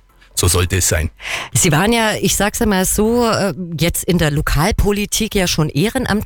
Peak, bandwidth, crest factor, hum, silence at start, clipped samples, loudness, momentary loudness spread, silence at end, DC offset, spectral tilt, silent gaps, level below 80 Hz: -4 dBFS; 19 kHz; 12 dB; none; 0.35 s; under 0.1%; -16 LUFS; 5 LU; 0 s; under 0.1%; -4 dB/octave; none; -28 dBFS